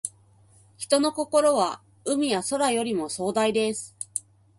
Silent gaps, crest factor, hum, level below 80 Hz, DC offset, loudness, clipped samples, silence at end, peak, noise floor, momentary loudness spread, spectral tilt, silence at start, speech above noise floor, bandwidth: none; 18 dB; none; -68 dBFS; under 0.1%; -25 LUFS; under 0.1%; 0.4 s; -8 dBFS; -57 dBFS; 12 LU; -3 dB/octave; 0.05 s; 33 dB; 11.5 kHz